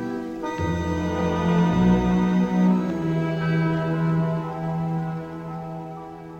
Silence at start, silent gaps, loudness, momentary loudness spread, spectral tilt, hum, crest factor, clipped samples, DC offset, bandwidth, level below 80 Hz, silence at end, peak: 0 s; none; -23 LUFS; 14 LU; -8 dB/octave; none; 14 dB; under 0.1%; under 0.1%; 7.8 kHz; -42 dBFS; 0 s; -10 dBFS